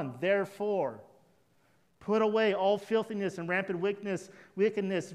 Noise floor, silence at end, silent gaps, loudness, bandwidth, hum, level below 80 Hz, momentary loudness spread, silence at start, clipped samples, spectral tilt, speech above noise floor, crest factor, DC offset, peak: -69 dBFS; 0 s; none; -31 LUFS; 12.5 kHz; none; -78 dBFS; 10 LU; 0 s; under 0.1%; -6 dB/octave; 39 dB; 16 dB; under 0.1%; -16 dBFS